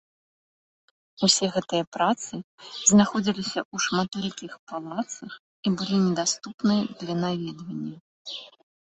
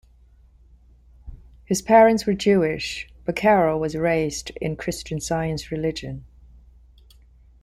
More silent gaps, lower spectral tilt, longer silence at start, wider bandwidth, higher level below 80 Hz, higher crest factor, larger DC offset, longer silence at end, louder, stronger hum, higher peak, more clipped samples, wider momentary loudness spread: first, 1.87-1.92 s, 2.44-2.58 s, 3.65-3.71 s, 4.59-4.67 s, 5.39-5.63 s, 6.54-6.58 s, 8.01-8.25 s vs none; second, -3.5 dB/octave vs -5 dB/octave; about the same, 1.2 s vs 1.25 s; second, 8.6 kHz vs 15.5 kHz; second, -66 dBFS vs -46 dBFS; about the same, 22 dB vs 20 dB; neither; second, 0.5 s vs 1.4 s; second, -25 LUFS vs -22 LUFS; neither; about the same, -4 dBFS vs -4 dBFS; neither; first, 18 LU vs 14 LU